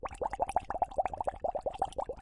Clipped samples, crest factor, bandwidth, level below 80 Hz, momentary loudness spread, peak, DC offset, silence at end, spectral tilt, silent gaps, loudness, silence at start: under 0.1%; 20 dB; 11.5 kHz; -52 dBFS; 3 LU; -16 dBFS; under 0.1%; 0 s; -5 dB/octave; none; -35 LUFS; 0 s